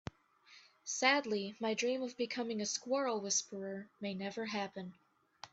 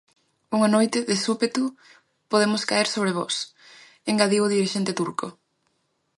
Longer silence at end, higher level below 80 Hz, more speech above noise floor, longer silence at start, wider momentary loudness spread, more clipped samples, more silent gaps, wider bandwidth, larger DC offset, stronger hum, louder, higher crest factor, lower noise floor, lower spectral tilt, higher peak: second, 0.05 s vs 0.85 s; about the same, -74 dBFS vs -72 dBFS; second, 27 dB vs 49 dB; about the same, 0.5 s vs 0.5 s; first, 16 LU vs 10 LU; neither; neither; second, 8.4 kHz vs 11.5 kHz; neither; neither; second, -37 LUFS vs -23 LUFS; about the same, 22 dB vs 20 dB; second, -64 dBFS vs -72 dBFS; second, -2.5 dB/octave vs -4 dB/octave; second, -16 dBFS vs -4 dBFS